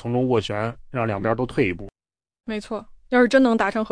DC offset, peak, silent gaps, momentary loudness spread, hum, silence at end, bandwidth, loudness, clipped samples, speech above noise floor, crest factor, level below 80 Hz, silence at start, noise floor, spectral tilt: under 0.1%; -6 dBFS; none; 16 LU; none; 0 s; 10.5 kHz; -22 LUFS; under 0.1%; over 69 dB; 16 dB; -48 dBFS; 0 s; under -90 dBFS; -6.5 dB/octave